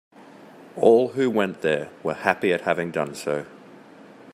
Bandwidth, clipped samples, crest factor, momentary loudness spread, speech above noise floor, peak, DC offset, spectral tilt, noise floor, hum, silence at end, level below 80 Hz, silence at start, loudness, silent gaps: 13.5 kHz; under 0.1%; 22 dB; 12 LU; 25 dB; -2 dBFS; under 0.1%; -5.5 dB/octave; -47 dBFS; none; 0.3 s; -68 dBFS; 0.4 s; -23 LUFS; none